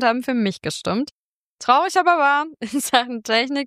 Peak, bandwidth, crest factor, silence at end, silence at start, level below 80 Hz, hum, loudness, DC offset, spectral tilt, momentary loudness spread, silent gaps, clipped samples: -2 dBFS; 15.5 kHz; 18 dB; 0 s; 0 s; -62 dBFS; none; -20 LUFS; under 0.1%; -3.5 dB/octave; 10 LU; 1.11-1.58 s; under 0.1%